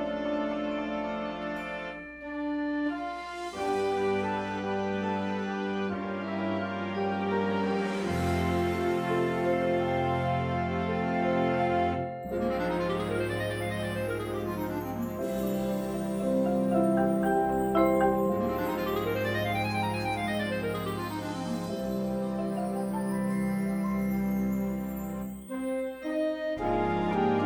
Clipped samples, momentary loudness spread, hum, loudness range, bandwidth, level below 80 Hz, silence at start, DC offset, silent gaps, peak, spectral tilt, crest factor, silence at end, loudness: under 0.1%; 7 LU; none; 5 LU; over 20 kHz; -52 dBFS; 0 s; under 0.1%; none; -10 dBFS; -6.5 dB/octave; 18 dB; 0 s; -30 LUFS